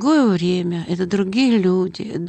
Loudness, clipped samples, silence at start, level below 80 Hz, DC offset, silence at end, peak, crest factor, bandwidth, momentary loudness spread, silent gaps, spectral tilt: -18 LUFS; under 0.1%; 0 s; -56 dBFS; under 0.1%; 0 s; -8 dBFS; 10 dB; 8.8 kHz; 7 LU; none; -6.5 dB/octave